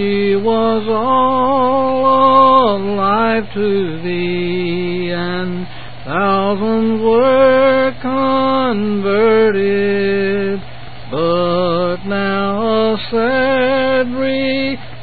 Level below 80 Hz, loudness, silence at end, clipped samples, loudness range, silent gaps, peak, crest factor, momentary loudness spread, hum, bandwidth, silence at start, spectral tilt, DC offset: -42 dBFS; -14 LUFS; 0 s; under 0.1%; 5 LU; none; 0 dBFS; 14 dB; 9 LU; none; 4.8 kHz; 0 s; -11.5 dB/octave; 4%